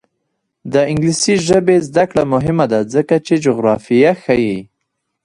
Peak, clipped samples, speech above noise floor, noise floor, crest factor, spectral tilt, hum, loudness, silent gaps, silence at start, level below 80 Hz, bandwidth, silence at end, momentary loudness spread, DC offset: 0 dBFS; under 0.1%; 59 dB; -73 dBFS; 14 dB; -5.5 dB/octave; none; -14 LUFS; none; 0.65 s; -46 dBFS; 11.5 kHz; 0.6 s; 4 LU; under 0.1%